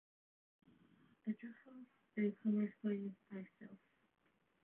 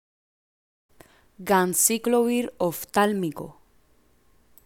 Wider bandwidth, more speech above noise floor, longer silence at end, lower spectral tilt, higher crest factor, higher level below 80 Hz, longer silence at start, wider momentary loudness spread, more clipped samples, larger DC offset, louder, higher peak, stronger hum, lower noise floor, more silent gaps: second, 3.5 kHz vs 17.5 kHz; second, 28 dB vs 38 dB; second, 0.85 s vs 1.15 s; first, -8.5 dB/octave vs -3.5 dB/octave; about the same, 16 dB vs 20 dB; second, under -90 dBFS vs -64 dBFS; second, 1.25 s vs 1.4 s; first, 21 LU vs 17 LU; neither; neither; second, -43 LUFS vs -23 LUFS; second, -30 dBFS vs -6 dBFS; neither; first, -71 dBFS vs -61 dBFS; neither